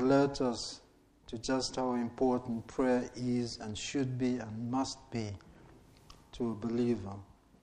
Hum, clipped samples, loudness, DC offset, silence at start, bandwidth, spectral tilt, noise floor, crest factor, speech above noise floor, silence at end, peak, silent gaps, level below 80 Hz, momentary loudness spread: none; under 0.1%; -34 LUFS; under 0.1%; 0 s; 10 kHz; -5.5 dB/octave; -58 dBFS; 18 dB; 25 dB; 0.35 s; -16 dBFS; none; -58 dBFS; 12 LU